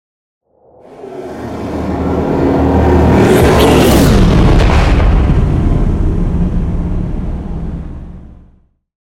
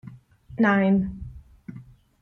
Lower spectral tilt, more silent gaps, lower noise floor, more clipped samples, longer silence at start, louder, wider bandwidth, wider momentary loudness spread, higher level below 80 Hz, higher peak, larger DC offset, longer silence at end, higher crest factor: second, -7 dB/octave vs -9 dB/octave; neither; about the same, -48 dBFS vs -46 dBFS; neither; first, 0.9 s vs 0.05 s; first, -11 LUFS vs -22 LUFS; first, 17 kHz vs 6.2 kHz; second, 17 LU vs 23 LU; first, -16 dBFS vs -48 dBFS; first, 0 dBFS vs -10 dBFS; neither; first, 0.7 s vs 0.4 s; about the same, 12 dB vs 16 dB